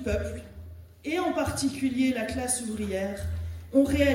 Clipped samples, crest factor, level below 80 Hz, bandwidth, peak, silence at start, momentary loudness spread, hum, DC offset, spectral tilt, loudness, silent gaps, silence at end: under 0.1%; 18 dB; -44 dBFS; 16.5 kHz; -10 dBFS; 0 s; 15 LU; none; under 0.1%; -5 dB/octave; -28 LUFS; none; 0 s